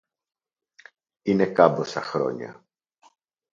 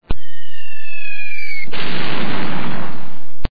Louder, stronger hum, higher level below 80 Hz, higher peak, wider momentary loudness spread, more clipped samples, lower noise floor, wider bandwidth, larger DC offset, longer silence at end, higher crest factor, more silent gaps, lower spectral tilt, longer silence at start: first, -23 LUFS vs -26 LUFS; neither; second, -68 dBFS vs -32 dBFS; about the same, -2 dBFS vs -2 dBFS; about the same, 16 LU vs 14 LU; neither; first, -59 dBFS vs -41 dBFS; first, 7.6 kHz vs 5.4 kHz; second, under 0.1% vs 50%; first, 1 s vs 0.05 s; first, 24 dB vs 14 dB; neither; about the same, -6.5 dB/octave vs -7 dB/octave; first, 1.25 s vs 0 s